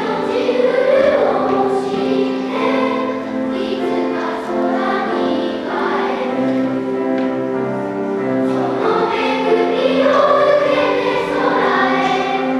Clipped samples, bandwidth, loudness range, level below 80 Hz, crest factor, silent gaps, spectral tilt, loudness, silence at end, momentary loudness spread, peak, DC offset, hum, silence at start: under 0.1%; 11 kHz; 4 LU; -56 dBFS; 14 dB; none; -6 dB/octave; -17 LUFS; 0 s; 7 LU; -2 dBFS; under 0.1%; none; 0 s